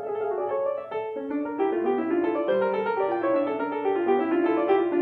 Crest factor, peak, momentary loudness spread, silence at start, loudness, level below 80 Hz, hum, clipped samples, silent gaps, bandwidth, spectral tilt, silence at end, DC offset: 14 dB; -10 dBFS; 7 LU; 0 s; -26 LUFS; -72 dBFS; none; under 0.1%; none; 4.6 kHz; -8.5 dB/octave; 0 s; under 0.1%